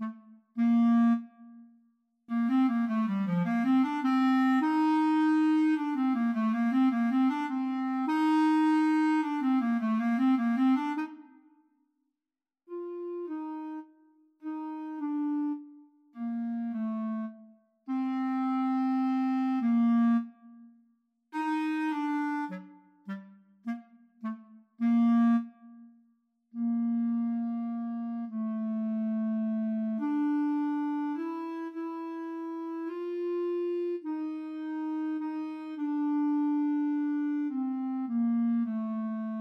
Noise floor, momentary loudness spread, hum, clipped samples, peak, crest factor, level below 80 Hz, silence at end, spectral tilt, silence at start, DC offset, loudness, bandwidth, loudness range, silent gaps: under -90 dBFS; 14 LU; none; under 0.1%; -18 dBFS; 12 dB; under -90 dBFS; 0 s; -7.5 dB/octave; 0 s; under 0.1%; -29 LUFS; 8.6 kHz; 9 LU; none